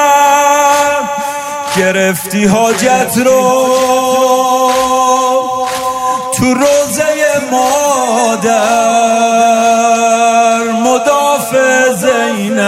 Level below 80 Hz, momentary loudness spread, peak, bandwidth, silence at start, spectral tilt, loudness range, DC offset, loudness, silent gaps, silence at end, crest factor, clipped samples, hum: -50 dBFS; 5 LU; 0 dBFS; 16 kHz; 0 s; -3 dB/octave; 2 LU; under 0.1%; -10 LUFS; none; 0 s; 10 dB; under 0.1%; none